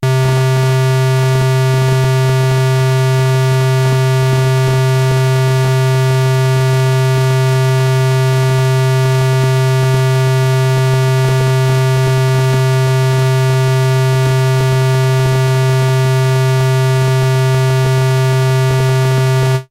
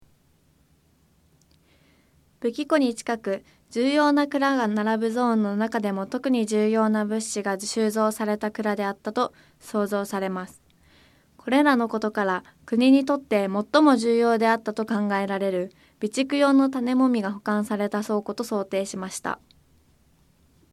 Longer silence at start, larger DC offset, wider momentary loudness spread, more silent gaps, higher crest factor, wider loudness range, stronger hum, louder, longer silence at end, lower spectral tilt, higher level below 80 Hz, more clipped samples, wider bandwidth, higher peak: second, 0 s vs 2.4 s; neither; second, 0 LU vs 11 LU; neither; second, 8 dB vs 20 dB; second, 0 LU vs 7 LU; neither; first, -12 LUFS vs -24 LUFS; second, 0.05 s vs 1.35 s; about the same, -6 dB/octave vs -5 dB/octave; first, -40 dBFS vs -66 dBFS; neither; about the same, 15.5 kHz vs 14.5 kHz; about the same, -4 dBFS vs -6 dBFS